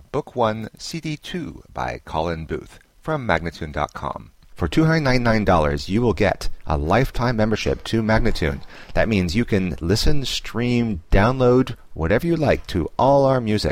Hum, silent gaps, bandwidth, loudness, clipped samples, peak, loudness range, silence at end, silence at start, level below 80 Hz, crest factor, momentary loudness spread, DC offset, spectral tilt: none; none; 16 kHz; -21 LUFS; under 0.1%; -2 dBFS; 7 LU; 0 s; 0 s; -30 dBFS; 18 dB; 12 LU; under 0.1%; -6 dB/octave